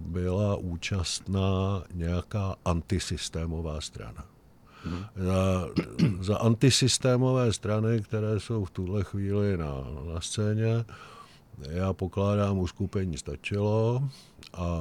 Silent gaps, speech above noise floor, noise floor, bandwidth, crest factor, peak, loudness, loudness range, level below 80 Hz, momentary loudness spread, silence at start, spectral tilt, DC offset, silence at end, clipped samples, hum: none; 26 dB; -54 dBFS; 13.5 kHz; 18 dB; -10 dBFS; -29 LUFS; 6 LU; -46 dBFS; 13 LU; 0 s; -5.5 dB/octave; under 0.1%; 0 s; under 0.1%; none